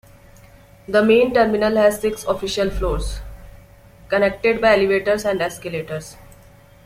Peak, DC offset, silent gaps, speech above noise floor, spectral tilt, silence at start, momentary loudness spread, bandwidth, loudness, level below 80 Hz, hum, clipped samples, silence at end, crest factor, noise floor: -2 dBFS; under 0.1%; none; 29 dB; -5 dB/octave; 0.9 s; 14 LU; 16 kHz; -18 LUFS; -36 dBFS; none; under 0.1%; 0.65 s; 18 dB; -47 dBFS